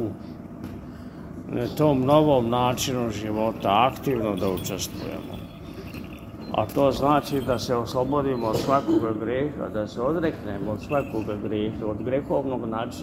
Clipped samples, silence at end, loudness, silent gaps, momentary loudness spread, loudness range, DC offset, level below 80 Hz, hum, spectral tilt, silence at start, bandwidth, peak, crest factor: under 0.1%; 0 s; -25 LUFS; none; 17 LU; 5 LU; under 0.1%; -46 dBFS; none; -6 dB/octave; 0 s; 16 kHz; -4 dBFS; 22 dB